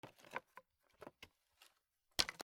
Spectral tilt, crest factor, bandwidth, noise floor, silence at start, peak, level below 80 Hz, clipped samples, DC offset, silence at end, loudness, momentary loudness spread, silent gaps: -1 dB/octave; 36 dB; 17.5 kHz; -82 dBFS; 0.05 s; -12 dBFS; -72 dBFS; under 0.1%; under 0.1%; 0 s; -44 LUFS; 25 LU; none